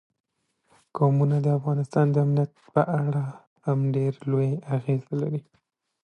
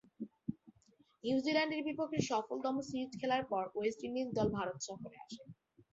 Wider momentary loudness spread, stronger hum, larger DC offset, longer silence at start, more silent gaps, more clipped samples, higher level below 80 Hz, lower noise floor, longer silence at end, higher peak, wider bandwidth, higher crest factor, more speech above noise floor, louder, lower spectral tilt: second, 8 LU vs 16 LU; neither; neither; first, 0.95 s vs 0.2 s; first, 3.47-3.56 s vs none; neither; about the same, -70 dBFS vs -68 dBFS; about the same, -69 dBFS vs -71 dBFS; first, 0.65 s vs 0.1 s; first, -6 dBFS vs -18 dBFS; about the same, 8.6 kHz vs 8 kHz; about the same, 18 dB vs 20 dB; first, 45 dB vs 33 dB; first, -25 LUFS vs -38 LUFS; first, -10 dB/octave vs -4 dB/octave